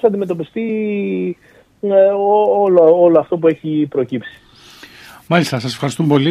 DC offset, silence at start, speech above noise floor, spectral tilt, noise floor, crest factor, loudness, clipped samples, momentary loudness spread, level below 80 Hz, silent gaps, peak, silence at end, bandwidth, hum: under 0.1%; 0.05 s; 27 dB; -7 dB/octave; -41 dBFS; 14 dB; -15 LUFS; under 0.1%; 12 LU; -60 dBFS; none; 0 dBFS; 0 s; 13.5 kHz; none